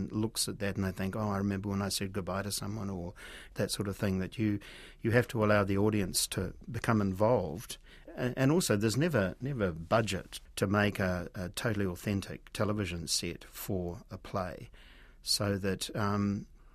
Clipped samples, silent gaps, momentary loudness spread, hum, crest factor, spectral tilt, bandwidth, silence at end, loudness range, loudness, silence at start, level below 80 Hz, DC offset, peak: under 0.1%; none; 13 LU; none; 22 dB; -5 dB/octave; 15.5 kHz; 0.05 s; 5 LU; -33 LUFS; 0 s; -54 dBFS; under 0.1%; -12 dBFS